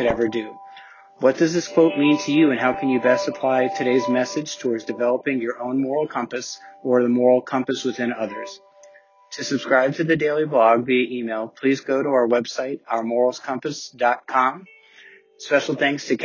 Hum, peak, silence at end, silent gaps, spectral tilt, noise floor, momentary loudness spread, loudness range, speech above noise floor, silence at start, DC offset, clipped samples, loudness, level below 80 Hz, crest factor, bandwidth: none; -4 dBFS; 0 s; none; -5 dB/octave; -50 dBFS; 11 LU; 4 LU; 30 dB; 0 s; under 0.1%; under 0.1%; -21 LUFS; -60 dBFS; 18 dB; 7.4 kHz